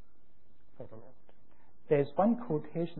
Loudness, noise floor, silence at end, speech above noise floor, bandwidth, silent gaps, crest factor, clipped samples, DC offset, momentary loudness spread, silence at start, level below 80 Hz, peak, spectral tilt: -31 LUFS; -70 dBFS; 0 s; 38 dB; 4 kHz; none; 18 dB; under 0.1%; 0.8%; 22 LU; 0.8 s; -70 dBFS; -16 dBFS; -8 dB/octave